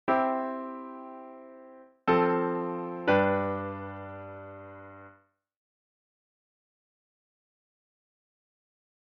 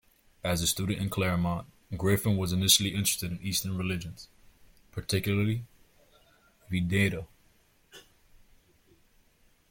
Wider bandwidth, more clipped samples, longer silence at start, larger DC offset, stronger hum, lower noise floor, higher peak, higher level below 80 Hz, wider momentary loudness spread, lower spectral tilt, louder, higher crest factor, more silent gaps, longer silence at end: second, 6.2 kHz vs 17 kHz; neither; second, 0.05 s vs 0.45 s; neither; neither; about the same, -62 dBFS vs -65 dBFS; about the same, -10 dBFS vs -8 dBFS; second, -70 dBFS vs -54 dBFS; first, 22 LU vs 18 LU; about the same, -5 dB/octave vs -4 dB/octave; about the same, -29 LUFS vs -29 LUFS; about the same, 22 dB vs 24 dB; neither; first, 3.9 s vs 1.7 s